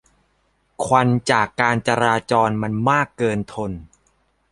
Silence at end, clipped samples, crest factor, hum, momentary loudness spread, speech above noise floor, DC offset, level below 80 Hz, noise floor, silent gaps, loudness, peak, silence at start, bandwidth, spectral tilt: 0.65 s; under 0.1%; 20 dB; none; 11 LU; 46 dB; under 0.1%; -50 dBFS; -65 dBFS; none; -19 LUFS; -2 dBFS; 0.8 s; 11.5 kHz; -5.5 dB/octave